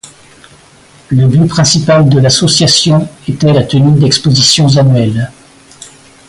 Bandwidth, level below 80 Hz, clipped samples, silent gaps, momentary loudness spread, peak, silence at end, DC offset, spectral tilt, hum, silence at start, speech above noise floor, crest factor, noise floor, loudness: 11.5 kHz; -40 dBFS; under 0.1%; none; 7 LU; 0 dBFS; 0.4 s; under 0.1%; -5 dB/octave; none; 0.05 s; 33 dB; 10 dB; -40 dBFS; -8 LUFS